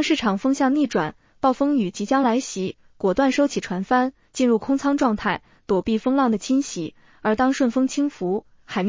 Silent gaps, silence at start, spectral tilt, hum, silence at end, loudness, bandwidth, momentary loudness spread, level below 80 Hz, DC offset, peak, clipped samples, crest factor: none; 0 s; -5 dB/octave; none; 0 s; -22 LUFS; 7.6 kHz; 9 LU; -54 dBFS; under 0.1%; -6 dBFS; under 0.1%; 14 dB